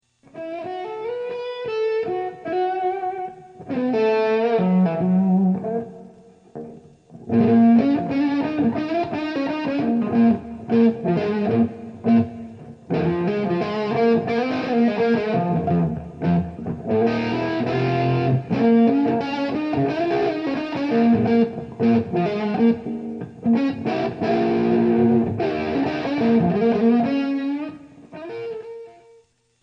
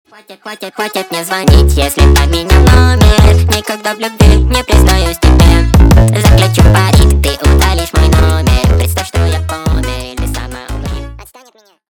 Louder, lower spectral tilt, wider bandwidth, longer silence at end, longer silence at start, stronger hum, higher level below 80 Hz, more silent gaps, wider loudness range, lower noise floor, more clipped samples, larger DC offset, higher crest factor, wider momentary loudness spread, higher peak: second, -21 LUFS vs -9 LUFS; first, -9 dB/octave vs -5.5 dB/octave; second, 6.2 kHz vs 19 kHz; about the same, 0.7 s vs 0.65 s; about the same, 0.35 s vs 0.3 s; neither; second, -54 dBFS vs -12 dBFS; neither; second, 2 LU vs 5 LU; first, -56 dBFS vs -45 dBFS; second, under 0.1% vs 0.2%; neither; first, 14 dB vs 8 dB; about the same, 12 LU vs 13 LU; second, -6 dBFS vs 0 dBFS